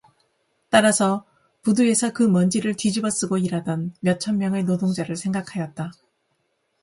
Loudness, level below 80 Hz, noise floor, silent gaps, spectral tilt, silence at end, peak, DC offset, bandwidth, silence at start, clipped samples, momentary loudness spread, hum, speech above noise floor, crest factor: -22 LUFS; -62 dBFS; -71 dBFS; none; -5 dB/octave; 0.9 s; -2 dBFS; under 0.1%; 11.5 kHz; 0.7 s; under 0.1%; 11 LU; none; 50 dB; 20 dB